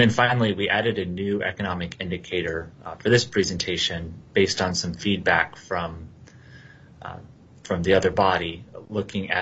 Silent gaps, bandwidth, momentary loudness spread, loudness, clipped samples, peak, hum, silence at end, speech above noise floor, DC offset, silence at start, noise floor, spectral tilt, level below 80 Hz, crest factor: none; 8.2 kHz; 14 LU; -24 LUFS; under 0.1%; -4 dBFS; none; 0 s; 23 dB; under 0.1%; 0 s; -47 dBFS; -4.5 dB/octave; -54 dBFS; 20 dB